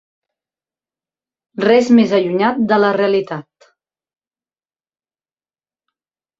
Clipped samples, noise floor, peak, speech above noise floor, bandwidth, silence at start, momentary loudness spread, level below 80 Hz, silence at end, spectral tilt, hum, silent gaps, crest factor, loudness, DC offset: under 0.1%; under -90 dBFS; -2 dBFS; over 76 dB; 7.6 kHz; 1.6 s; 16 LU; -62 dBFS; 3 s; -6.5 dB/octave; none; none; 18 dB; -14 LUFS; under 0.1%